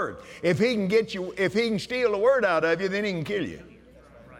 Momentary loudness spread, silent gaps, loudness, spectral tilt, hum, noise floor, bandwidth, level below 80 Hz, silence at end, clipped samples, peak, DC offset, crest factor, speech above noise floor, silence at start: 10 LU; none; -25 LUFS; -5.5 dB/octave; none; -51 dBFS; 13.5 kHz; -58 dBFS; 0 s; under 0.1%; -10 dBFS; under 0.1%; 14 dB; 26 dB; 0 s